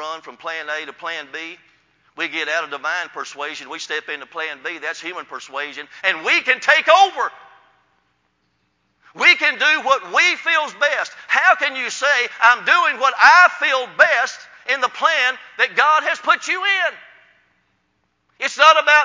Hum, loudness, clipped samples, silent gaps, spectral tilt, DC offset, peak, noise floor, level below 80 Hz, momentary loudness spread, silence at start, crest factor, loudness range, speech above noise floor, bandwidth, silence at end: none; -16 LUFS; under 0.1%; none; 0 dB/octave; under 0.1%; 0 dBFS; -68 dBFS; -72 dBFS; 16 LU; 0 s; 18 dB; 11 LU; 50 dB; 7.6 kHz; 0 s